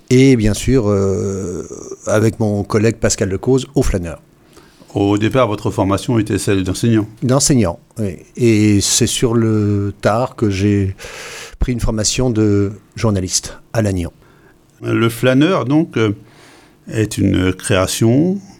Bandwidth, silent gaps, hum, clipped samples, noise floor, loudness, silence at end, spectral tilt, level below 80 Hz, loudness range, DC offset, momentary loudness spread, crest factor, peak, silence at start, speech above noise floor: 16.5 kHz; none; none; under 0.1%; -48 dBFS; -16 LUFS; 0.1 s; -5.5 dB/octave; -32 dBFS; 3 LU; under 0.1%; 12 LU; 14 dB; -2 dBFS; 0.1 s; 33 dB